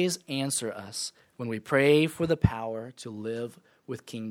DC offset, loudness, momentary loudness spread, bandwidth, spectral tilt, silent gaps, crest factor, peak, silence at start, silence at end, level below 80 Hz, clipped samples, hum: under 0.1%; -28 LUFS; 17 LU; 17.5 kHz; -5 dB/octave; none; 22 dB; -8 dBFS; 0 s; 0 s; -48 dBFS; under 0.1%; none